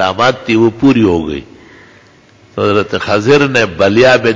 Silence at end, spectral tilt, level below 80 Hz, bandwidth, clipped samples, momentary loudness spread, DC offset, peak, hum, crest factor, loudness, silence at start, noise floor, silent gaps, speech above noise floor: 0 s; -5.5 dB/octave; -38 dBFS; 7.6 kHz; under 0.1%; 8 LU; under 0.1%; 0 dBFS; none; 12 dB; -11 LUFS; 0 s; -44 dBFS; none; 33 dB